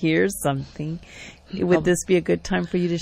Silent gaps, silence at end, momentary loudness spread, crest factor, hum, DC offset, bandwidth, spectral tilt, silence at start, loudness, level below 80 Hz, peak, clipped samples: none; 0 s; 15 LU; 16 dB; none; under 0.1%; 15 kHz; -5.5 dB/octave; 0 s; -23 LUFS; -46 dBFS; -6 dBFS; under 0.1%